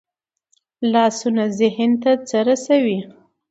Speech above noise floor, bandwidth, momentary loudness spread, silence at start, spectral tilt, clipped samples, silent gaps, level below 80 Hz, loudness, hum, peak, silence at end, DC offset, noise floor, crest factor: 50 dB; 8 kHz; 5 LU; 0.8 s; -5 dB/octave; under 0.1%; none; -68 dBFS; -18 LUFS; none; -4 dBFS; 0.4 s; under 0.1%; -68 dBFS; 16 dB